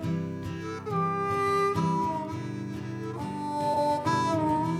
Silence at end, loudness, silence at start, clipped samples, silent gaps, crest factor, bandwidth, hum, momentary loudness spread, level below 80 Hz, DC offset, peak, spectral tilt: 0 s; -29 LUFS; 0 s; under 0.1%; none; 14 dB; 13.5 kHz; none; 10 LU; -62 dBFS; under 0.1%; -14 dBFS; -6.5 dB/octave